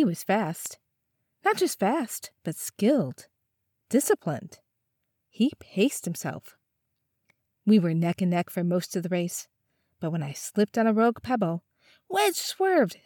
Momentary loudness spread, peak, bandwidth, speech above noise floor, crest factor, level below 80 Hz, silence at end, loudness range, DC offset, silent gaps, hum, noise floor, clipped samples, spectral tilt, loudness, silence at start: 12 LU; -10 dBFS; 19 kHz; 53 dB; 18 dB; -72 dBFS; 0.1 s; 2 LU; under 0.1%; none; none; -79 dBFS; under 0.1%; -5 dB/octave; -27 LUFS; 0 s